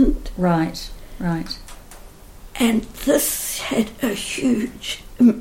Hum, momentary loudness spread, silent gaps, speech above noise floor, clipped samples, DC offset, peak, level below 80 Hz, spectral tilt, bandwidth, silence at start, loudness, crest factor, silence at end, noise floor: none; 15 LU; none; 20 dB; under 0.1%; under 0.1%; -4 dBFS; -34 dBFS; -4.5 dB/octave; 17 kHz; 0 s; -21 LUFS; 16 dB; 0 s; -41 dBFS